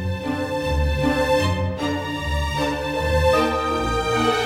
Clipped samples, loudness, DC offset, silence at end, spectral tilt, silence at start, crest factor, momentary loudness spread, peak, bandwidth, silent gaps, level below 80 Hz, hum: under 0.1%; -22 LUFS; under 0.1%; 0 s; -5.5 dB/octave; 0 s; 16 dB; 7 LU; -6 dBFS; 16.5 kHz; none; -32 dBFS; none